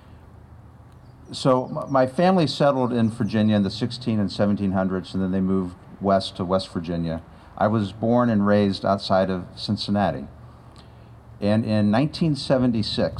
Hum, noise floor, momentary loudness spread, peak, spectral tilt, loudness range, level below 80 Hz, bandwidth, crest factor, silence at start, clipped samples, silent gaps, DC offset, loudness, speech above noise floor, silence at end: none; -46 dBFS; 9 LU; -6 dBFS; -7 dB/octave; 3 LU; -52 dBFS; 10.5 kHz; 16 dB; 0.1 s; under 0.1%; none; under 0.1%; -22 LUFS; 25 dB; 0 s